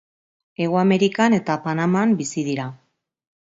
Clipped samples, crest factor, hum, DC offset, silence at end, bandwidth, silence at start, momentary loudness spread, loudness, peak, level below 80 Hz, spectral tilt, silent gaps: under 0.1%; 18 dB; none; under 0.1%; 0.75 s; 8 kHz; 0.6 s; 10 LU; -20 LUFS; -2 dBFS; -66 dBFS; -6 dB/octave; none